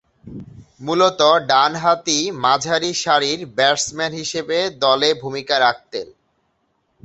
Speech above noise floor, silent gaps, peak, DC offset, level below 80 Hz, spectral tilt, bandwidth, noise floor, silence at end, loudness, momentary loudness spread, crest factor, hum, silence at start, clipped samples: 49 dB; none; -2 dBFS; under 0.1%; -58 dBFS; -2.5 dB/octave; 8.2 kHz; -67 dBFS; 0.95 s; -17 LUFS; 16 LU; 18 dB; none; 0.25 s; under 0.1%